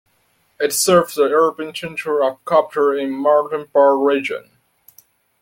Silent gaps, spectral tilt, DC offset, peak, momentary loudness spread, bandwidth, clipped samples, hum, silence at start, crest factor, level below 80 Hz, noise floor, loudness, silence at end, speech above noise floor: none; -3.5 dB/octave; under 0.1%; -2 dBFS; 11 LU; 17 kHz; under 0.1%; none; 0.6 s; 16 dB; -62 dBFS; -62 dBFS; -17 LUFS; 1.05 s; 45 dB